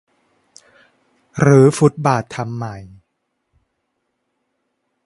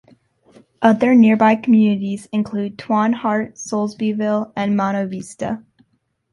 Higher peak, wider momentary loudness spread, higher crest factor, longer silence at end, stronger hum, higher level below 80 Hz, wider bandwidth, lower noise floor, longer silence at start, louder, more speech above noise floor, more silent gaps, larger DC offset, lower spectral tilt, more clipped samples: about the same, 0 dBFS vs -2 dBFS; first, 20 LU vs 14 LU; about the same, 20 dB vs 16 dB; first, 2.2 s vs 0.75 s; neither; first, -54 dBFS vs -60 dBFS; about the same, 11.5 kHz vs 11.5 kHz; first, -72 dBFS vs -66 dBFS; first, 1.35 s vs 0.8 s; first, -15 LUFS vs -18 LUFS; first, 58 dB vs 49 dB; neither; neither; about the same, -7 dB/octave vs -6.5 dB/octave; neither